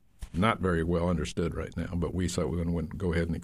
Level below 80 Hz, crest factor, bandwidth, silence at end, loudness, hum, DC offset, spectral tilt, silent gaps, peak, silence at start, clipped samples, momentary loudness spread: -42 dBFS; 20 dB; 13 kHz; 0 s; -30 LUFS; none; under 0.1%; -6.5 dB/octave; none; -10 dBFS; 0.2 s; under 0.1%; 6 LU